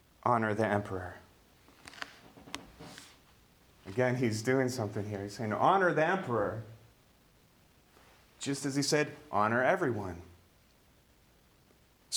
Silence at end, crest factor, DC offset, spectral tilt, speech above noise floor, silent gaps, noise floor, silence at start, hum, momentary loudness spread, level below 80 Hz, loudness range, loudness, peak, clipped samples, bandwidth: 0 s; 22 dB; under 0.1%; -5 dB/octave; 34 dB; none; -65 dBFS; 0.25 s; none; 22 LU; -66 dBFS; 7 LU; -31 LUFS; -12 dBFS; under 0.1%; over 20 kHz